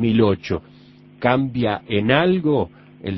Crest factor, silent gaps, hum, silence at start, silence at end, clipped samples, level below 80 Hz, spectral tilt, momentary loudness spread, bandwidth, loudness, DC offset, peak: 20 dB; none; none; 0 s; 0 s; under 0.1%; -46 dBFS; -8.5 dB/octave; 11 LU; 6 kHz; -20 LUFS; under 0.1%; 0 dBFS